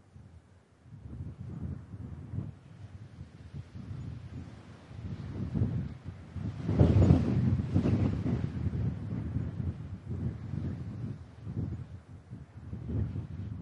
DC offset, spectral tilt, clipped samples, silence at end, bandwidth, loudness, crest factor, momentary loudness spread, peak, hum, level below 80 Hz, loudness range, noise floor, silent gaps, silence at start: under 0.1%; -9.5 dB/octave; under 0.1%; 0 s; 7.4 kHz; -33 LUFS; 24 dB; 21 LU; -8 dBFS; none; -48 dBFS; 15 LU; -59 dBFS; none; 0.15 s